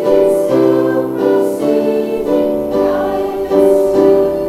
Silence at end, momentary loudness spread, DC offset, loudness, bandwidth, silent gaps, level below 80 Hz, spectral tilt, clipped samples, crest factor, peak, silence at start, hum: 0 s; 5 LU; under 0.1%; -13 LUFS; 15 kHz; none; -42 dBFS; -7 dB/octave; under 0.1%; 12 dB; 0 dBFS; 0 s; none